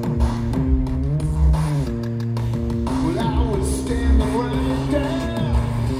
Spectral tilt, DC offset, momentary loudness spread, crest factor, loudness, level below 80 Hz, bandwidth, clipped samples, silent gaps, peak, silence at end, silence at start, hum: -7 dB/octave; under 0.1%; 4 LU; 14 dB; -21 LUFS; -24 dBFS; 14 kHz; under 0.1%; none; -6 dBFS; 0 s; 0 s; none